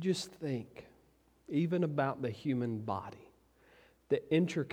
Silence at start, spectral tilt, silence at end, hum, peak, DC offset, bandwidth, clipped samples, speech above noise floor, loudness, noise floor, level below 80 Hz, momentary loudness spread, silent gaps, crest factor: 0 s; -6.5 dB/octave; 0 s; none; -16 dBFS; under 0.1%; 15 kHz; under 0.1%; 34 dB; -35 LUFS; -68 dBFS; -72 dBFS; 10 LU; none; 20 dB